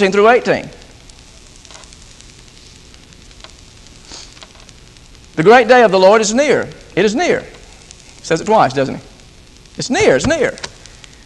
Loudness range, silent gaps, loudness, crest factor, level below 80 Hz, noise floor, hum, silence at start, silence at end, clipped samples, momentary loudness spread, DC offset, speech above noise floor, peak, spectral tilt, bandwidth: 6 LU; none; -13 LUFS; 16 dB; -42 dBFS; -41 dBFS; none; 0 s; 0.6 s; under 0.1%; 24 LU; under 0.1%; 30 dB; 0 dBFS; -4 dB/octave; 11.5 kHz